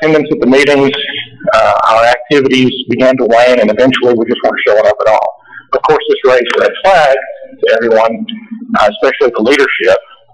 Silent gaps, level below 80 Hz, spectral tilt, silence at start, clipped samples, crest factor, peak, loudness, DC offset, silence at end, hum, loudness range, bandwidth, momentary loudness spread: none; -44 dBFS; -5 dB/octave; 0 s; under 0.1%; 8 dB; 0 dBFS; -9 LUFS; under 0.1%; 0.35 s; none; 2 LU; 11.5 kHz; 8 LU